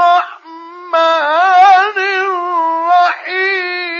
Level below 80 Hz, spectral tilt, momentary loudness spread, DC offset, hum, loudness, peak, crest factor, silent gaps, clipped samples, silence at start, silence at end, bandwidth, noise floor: -80 dBFS; 0 dB/octave; 9 LU; under 0.1%; none; -12 LUFS; 0 dBFS; 12 dB; none; under 0.1%; 0 s; 0 s; 7.2 kHz; -32 dBFS